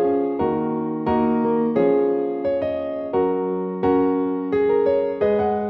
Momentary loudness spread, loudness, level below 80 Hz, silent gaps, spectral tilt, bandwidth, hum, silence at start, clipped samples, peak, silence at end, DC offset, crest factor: 5 LU; -21 LUFS; -52 dBFS; none; -10.5 dB/octave; 5.2 kHz; none; 0 s; under 0.1%; -6 dBFS; 0 s; under 0.1%; 14 dB